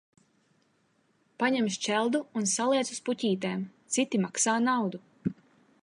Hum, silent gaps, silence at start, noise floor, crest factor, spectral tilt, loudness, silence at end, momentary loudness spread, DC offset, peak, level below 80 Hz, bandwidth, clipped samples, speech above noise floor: none; none; 1.4 s; -70 dBFS; 18 dB; -3.5 dB/octave; -29 LUFS; 0.5 s; 10 LU; under 0.1%; -12 dBFS; -74 dBFS; 11.5 kHz; under 0.1%; 42 dB